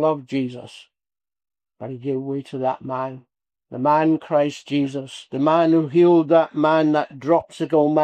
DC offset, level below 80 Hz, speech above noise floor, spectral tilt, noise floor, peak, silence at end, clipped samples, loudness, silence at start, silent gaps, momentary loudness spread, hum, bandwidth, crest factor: under 0.1%; -70 dBFS; over 70 dB; -7.5 dB/octave; under -90 dBFS; -4 dBFS; 0 s; under 0.1%; -20 LUFS; 0 s; none; 15 LU; none; 9.2 kHz; 16 dB